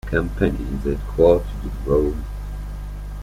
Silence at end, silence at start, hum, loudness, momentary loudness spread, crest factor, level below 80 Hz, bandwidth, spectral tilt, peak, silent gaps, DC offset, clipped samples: 0 s; 0.05 s; 50 Hz at -25 dBFS; -21 LUFS; 16 LU; 18 dB; -28 dBFS; 15.5 kHz; -8 dB/octave; -4 dBFS; none; under 0.1%; under 0.1%